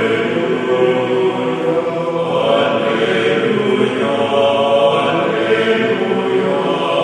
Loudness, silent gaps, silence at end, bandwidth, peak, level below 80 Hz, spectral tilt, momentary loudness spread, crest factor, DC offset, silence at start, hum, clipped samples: -15 LUFS; none; 0 s; 10.5 kHz; -2 dBFS; -62 dBFS; -6 dB/octave; 4 LU; 14 dB; under 0.1%; 0 s; none; under 0.1%